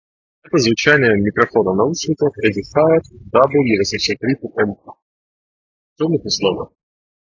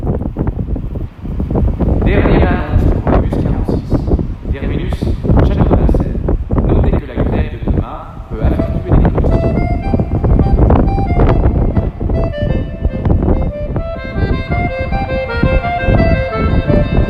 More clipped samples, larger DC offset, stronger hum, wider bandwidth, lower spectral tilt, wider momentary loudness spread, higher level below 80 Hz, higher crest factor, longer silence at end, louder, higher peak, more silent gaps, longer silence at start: neither; neither; neither; first, 7.4 kHz vs 5.2 kHz; second, -5 dB/octave vs -10 dB/octave; about the same, 8 LU vs 8 LU; second, -48 dBFS vs -16 dBFS; first, 18 dB vs 12 dB; first, 0.65 s vs 0 s; about the same, -16 LUFS vs -15 LUFS; about the same, 0 dBFS vs 0 dBFS; first, 5.02-5.96 s vs none; first, 0.55 s vs 0 s